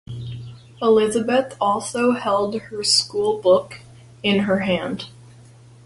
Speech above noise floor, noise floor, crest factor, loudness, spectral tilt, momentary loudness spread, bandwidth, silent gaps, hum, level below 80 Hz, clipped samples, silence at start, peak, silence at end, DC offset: 27 dB; -46 dBFS; 18 dB; -20 LUFS; -4 dB/octave; 17 LU; 11.5 kHz; none; none; -56 dBFS; under 0.1%; 0.1 s; -4 dBFS; 0.75 s; under 0.1%